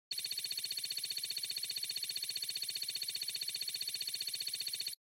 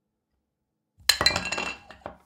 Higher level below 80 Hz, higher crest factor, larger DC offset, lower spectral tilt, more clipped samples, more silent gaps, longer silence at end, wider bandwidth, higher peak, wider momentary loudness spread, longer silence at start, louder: second, under -90 dBFS vs -52 dBFS; second, 12 dB vs 26 dB; neither; second, 2.5 dB/octave vs -1 dB/octave; neither; neither; about the same, 0.15 s vs 0.1 s; about the same, 17 kHz vs 17.5 kHz; second, -28 dBFS vs -4 dBFS; second, 0 LU vs 19 LU; second, 0.1 s vs 1.1 s; second, -37 LUFS vs -24 LUFS